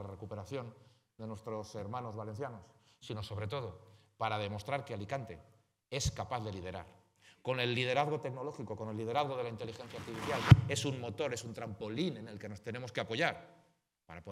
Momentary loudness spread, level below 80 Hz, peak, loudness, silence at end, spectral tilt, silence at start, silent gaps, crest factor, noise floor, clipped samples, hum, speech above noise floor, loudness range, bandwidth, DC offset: 14 LU; -56 dBFS; -6 dBFS; -37 LUFS; 0 s; -5.5 dB/octave; 0 s; none; 30 dB; -71 dBFS; under 0.1%; none; 35 dB; 11 LU; 14 kHz; under 0.1%